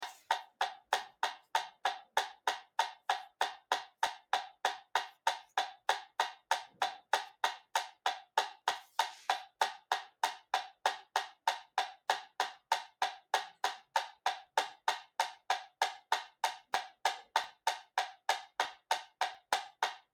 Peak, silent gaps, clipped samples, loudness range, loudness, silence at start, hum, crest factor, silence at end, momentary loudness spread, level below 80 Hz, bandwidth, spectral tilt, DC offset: -14 dBFS; none; under 0.1%; 1 LU; -37 LUFS; 0 s; none; 24 dB; 0.15 s; 4 LU; -90 dBFS; 19 kHz; 2 dB/octave; under 0.1%